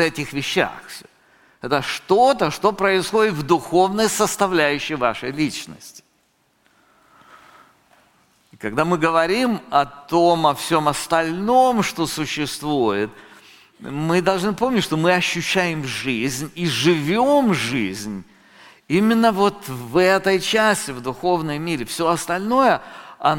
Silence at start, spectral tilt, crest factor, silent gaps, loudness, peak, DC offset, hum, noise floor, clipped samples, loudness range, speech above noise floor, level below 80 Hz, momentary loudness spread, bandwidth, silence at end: 0 s; -4.5 dB/octave; 18 dB; none; -19 LUFS; -2 dBFS; under 0.1%; none; -63 dBFS; under 0.1%; 6 LU; 44 dB; -52 dBFS; 10 LU; 17 kHz; 0 s